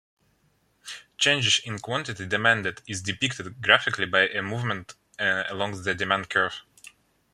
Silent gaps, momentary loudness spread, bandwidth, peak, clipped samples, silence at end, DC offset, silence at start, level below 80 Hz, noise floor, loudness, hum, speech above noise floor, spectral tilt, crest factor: none; 14 LU; 14 kHz; -2 dBFS; under 0.1%; 0.45 s; under 0.1%; 0.85 s; -66 dBFS; -67 dBFS; -24 LUFS; none; 41 dB; -2.5 dB/octave; 26 dB